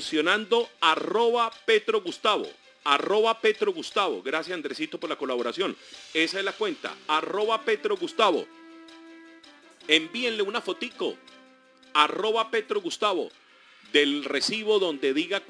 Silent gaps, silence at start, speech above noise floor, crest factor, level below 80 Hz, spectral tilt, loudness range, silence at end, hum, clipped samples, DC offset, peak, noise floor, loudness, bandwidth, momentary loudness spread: none; 0 s; 30 dB; 22 dB; -76 dBFS; -2.5 dB/octave; 4 LU; 0.05 s; none; under 0.1%; under 0.1%; -4 dBFS; -56 dBFS; -26 LUFS; 10.5 kHz; 10 LU